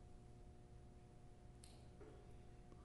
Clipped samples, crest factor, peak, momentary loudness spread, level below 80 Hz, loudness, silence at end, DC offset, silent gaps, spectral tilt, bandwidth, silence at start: under 0.1%; 20 dB; -40 dBFS; 3 LU; -64 dBFS; -64 LUFS; 0 s; under 0.1%; none; -6 dB/octave; 11.5 kHz; 0 s